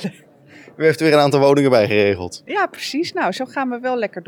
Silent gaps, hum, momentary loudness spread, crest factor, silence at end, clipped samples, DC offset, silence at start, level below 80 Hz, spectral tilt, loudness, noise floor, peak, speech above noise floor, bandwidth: none; none; 10 LU; 16 dB; 0.05 s; under 0.1%; under 0.1%; 0 s; -66 dBFS; -5.5 dB/octave; -17 LUFS; -45 dBFS; -2 dBFS; 28 dB; 17 kHz